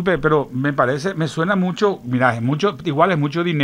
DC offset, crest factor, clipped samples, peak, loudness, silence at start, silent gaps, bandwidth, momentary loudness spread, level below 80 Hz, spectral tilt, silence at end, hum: under 0.1%; 18 dB; under 0.1%; -2 dBFS; -19 LUFS; 0 s; none; 11 kHz; 4 LU; -48 dBFS; -7 dB/octave; 0 s; none